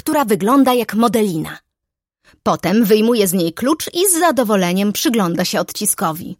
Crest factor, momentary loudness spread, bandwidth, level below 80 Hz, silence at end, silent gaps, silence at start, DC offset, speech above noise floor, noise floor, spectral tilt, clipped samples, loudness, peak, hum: 16 dB; 6 LU; 17 kHz; -56 dBFS; 0.05 s; none; 0.05 s; under 0.1%; 66 dB; -81 dBFS; -4 dB/octave; under 0.1%; -16 LUFS; 0 dBFS; none